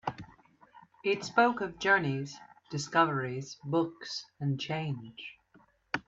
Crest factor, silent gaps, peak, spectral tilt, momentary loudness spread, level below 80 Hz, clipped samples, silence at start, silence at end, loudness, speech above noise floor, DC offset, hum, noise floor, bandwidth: 22 dB; none; -10 dBFS; -5 dB/octave; 17 LU; -68 dBFS; under 0.1%; 0.05 s; 0.05 s; -31 LUFS; 34 dB; under 0.1%; none; -65 dBFS; 8 kHz